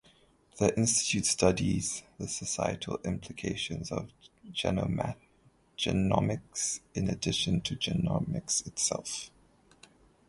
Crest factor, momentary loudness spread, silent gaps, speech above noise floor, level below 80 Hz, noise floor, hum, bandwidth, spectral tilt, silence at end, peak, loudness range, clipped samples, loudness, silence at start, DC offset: 22 dB; 11 LU; none; 34 dB; -52 dBFS; -65 dBFS; none; 11.5 kHz; -4 dB/octave; 1 s; -10 dBFS; 5 LU; under 0.1%; -31 LUFS; 0.55 s; under 0.1%